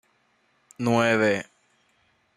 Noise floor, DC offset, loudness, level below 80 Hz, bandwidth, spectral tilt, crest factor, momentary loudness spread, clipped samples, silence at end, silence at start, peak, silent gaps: -67 dBFS; under 0.1%; -23 LUFS; -68 dBFS; 12.5 kHz; -5.5 dB/octave; 20 dB; 11 LU; under 0.1%; 0.95 s; 0.8 s; -8 dBFS; none